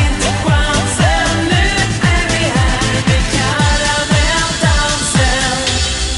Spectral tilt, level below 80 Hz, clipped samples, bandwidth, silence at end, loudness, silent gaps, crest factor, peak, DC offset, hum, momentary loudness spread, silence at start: -3.5 dB/octave; -20 dBFS; under 0.1%; 11.5 kHz; 0 s; -13 LUFS; none; 12 dB; -2 dBFS; under 0.1%; none; 2 LU; 0 s